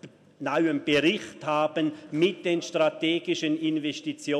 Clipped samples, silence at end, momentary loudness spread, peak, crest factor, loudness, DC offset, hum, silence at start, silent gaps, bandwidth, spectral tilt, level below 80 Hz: under 0.1%; 0 s; 7 LU; -10 dBFS; 16 dB; -26 LUFS; under 0.1%; none; 0.05 s; none; 11 kHz; -5 dB/octave; -72 dBFS